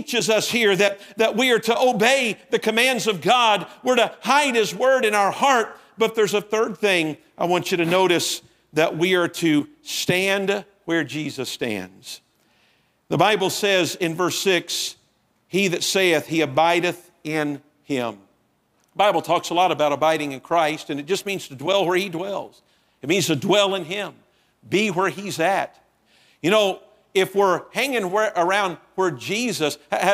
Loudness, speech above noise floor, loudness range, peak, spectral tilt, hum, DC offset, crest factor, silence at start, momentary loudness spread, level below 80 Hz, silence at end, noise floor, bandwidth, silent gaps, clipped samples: -21 LUFS; 44 dB; 5 LU; -2 dBFS; -3.5 dB/octave; none; under 0.1%; 20 dB; 0 s; 10 LU; -68 dBFS; 0 s; -65 dBFS; 16 kHz; none; under 0.1%